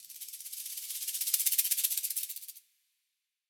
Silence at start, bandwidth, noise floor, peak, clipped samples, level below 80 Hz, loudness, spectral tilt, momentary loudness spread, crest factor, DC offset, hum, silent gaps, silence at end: 0 s; over 20 kHz; -85 dBFS; -10 dBFS; under 0.1%; under -90 dBFS; -30 LUFS; 7.5 dB/octave; 16 LU; 26 dB; under 0.1%; none; none; 0.9 s